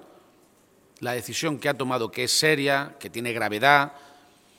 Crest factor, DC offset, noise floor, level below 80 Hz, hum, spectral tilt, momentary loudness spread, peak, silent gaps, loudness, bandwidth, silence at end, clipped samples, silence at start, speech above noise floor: 24 dB; under 0.1%; -59 dBFS; -72 dBFS; none; -3 dB/octave; 12 LU; -2 dBFS; none; -24 LUFS; 17 kHz; 0.6 s; under 0.1%; 1 s; 35 dB